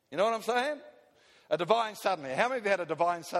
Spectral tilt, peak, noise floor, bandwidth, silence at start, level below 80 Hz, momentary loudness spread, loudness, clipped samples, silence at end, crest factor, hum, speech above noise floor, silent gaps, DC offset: -4 dB/octave; -10 dBFS; -62 dBFS; 15.5 kHz; 0.1 s; -80 dBFS; 6 LU; -30 LUFS; under 0.1%; 0 s; 20 dB; none; 32 dB; none; under 0.1%